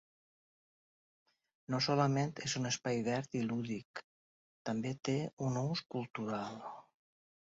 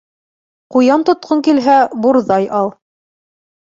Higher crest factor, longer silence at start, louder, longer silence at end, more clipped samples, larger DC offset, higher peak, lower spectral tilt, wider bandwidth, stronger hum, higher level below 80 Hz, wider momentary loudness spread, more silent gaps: first, 22 dB vs 14 dB; first, 1.7 s vs 0.7 s; second, -37 LUFS vs -13 LUFS; second, 0.75 s vs 1.05 s; neither; neither; second, -16 dBFS vs -2 dBFS; about the same, -5 dB/octave vs -6 dB/octave; about the same, 7.6 kHz vs 7.6 kHz; neither; second, -74 dBFS vs -60 dBFS; first, 14 LU vs 7 LU; first, 3.85-3.94 s, 4.04-4.65 s, 5.33-5.37 s, 6.10-6.14 s vs none